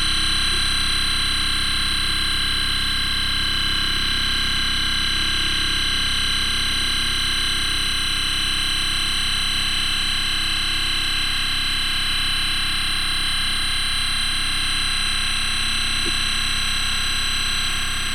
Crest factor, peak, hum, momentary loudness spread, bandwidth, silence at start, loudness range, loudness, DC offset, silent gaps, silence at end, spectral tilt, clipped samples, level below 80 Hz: 12 dB; -8 dBFS; none; 1 LU; 16.5 kHz; 0 s; 1 LU; -20 LUFS; under 0.1%; none; 0 s; -1 dB/octave; under 0.1%; -28 dBFS